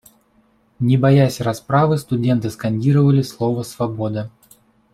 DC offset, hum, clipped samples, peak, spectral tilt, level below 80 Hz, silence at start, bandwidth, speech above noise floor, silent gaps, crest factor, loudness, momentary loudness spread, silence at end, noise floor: under 0.1%; none; under 0.1%; -2 dBFS; -7.5 dB/octave; -54 dBFS; 0.8 s; 14 kHz; 41 dB; none; 16 dB; -18 LUFS; 10 LU; 0.65 s; -58 dBFS